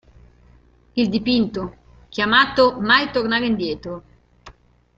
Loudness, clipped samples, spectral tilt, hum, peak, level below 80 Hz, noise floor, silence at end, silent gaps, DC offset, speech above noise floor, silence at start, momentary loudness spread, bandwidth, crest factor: -19 LUFS; under 0.1%; -5.5 dB/octave; 60 Hz at -45 dBFS; 0 dBFS; -48 dBFS; -52 dBFS; 0.45 s; none; under 0.1%; 34 dB; 0.95 s; 17 LU; 7.6 kHz; 20 dB